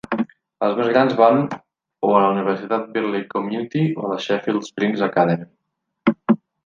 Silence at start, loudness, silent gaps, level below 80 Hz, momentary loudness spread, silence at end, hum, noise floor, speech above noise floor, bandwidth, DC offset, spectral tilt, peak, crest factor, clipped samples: 0.1 s; -20 LUFS; none; -66 dBFS; 9 LU; 0.3 s; none; -77 dBFS; 58 dB; 7.4 kHz; under 0.1%; -7.5 dB/octave; -2 dBFS; 18 dB; under 0.1%